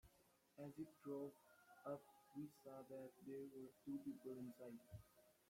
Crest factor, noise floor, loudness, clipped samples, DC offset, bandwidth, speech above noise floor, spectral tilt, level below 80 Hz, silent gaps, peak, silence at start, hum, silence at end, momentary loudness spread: 16 dB; -78 dBFS; -57 LUFS; under 0.1%; under 0.1%; 16.5 kHz; 23 dB; -7.5 dB/octave; -84 dBFS; none; -40 dBFS; 0.05 s; none; 0.15 s; 8 LU